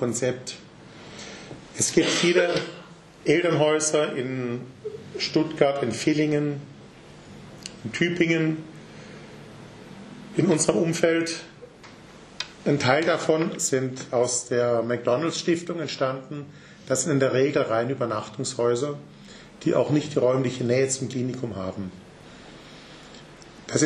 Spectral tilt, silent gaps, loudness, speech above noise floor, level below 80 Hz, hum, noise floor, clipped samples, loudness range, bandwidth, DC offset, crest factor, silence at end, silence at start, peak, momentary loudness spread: -4.5 dB/octave; none; -24 LUFS; 23 dB; -62 dBFS; none; -46 dBFS; under 0.1%; 4 LU; 12 kHz; under 0.1%; 22 dB; 0 s; 0 s; -4 dBFS; 23 LU